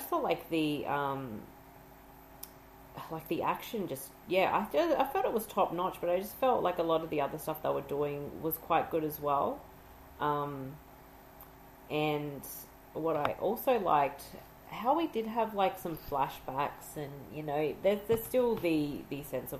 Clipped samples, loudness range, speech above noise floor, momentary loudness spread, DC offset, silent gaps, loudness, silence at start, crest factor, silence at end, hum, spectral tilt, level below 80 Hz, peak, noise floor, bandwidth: under 0.1%; 6 LU; 22 dB; 17 LU; under 0.1%; none; -33 LUFS; 0 s; 22 dB; 0 s; none; -5.5 dB/octave; -60 dBFS; -12 dBFS; -54 dBFS; 15.5 kHz